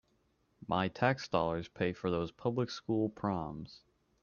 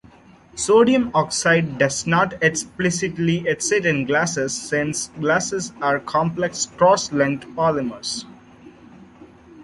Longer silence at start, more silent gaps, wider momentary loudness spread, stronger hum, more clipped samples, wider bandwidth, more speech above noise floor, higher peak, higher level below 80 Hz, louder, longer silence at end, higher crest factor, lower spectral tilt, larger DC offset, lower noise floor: about the same, 0.6 s vs 0.55 s; neither; first, 11 LU vs 8 LU; neither; neither; second, 7.2 kHz vs 11.5 kHz; first, 40 dB vs 28 dB; second, -14 dBFS vs -4 dBFS; second, -64 dBFS vs -54 dBFS; second, -35 LUFS vs -20 LUFS; first, 0.45 s vs 0 s; about the same, 22 dB vs 18 dB; first, -6.5 dB/octave vs -4 dB/octave; neither; first, -74 dBFS vs -48 dBFS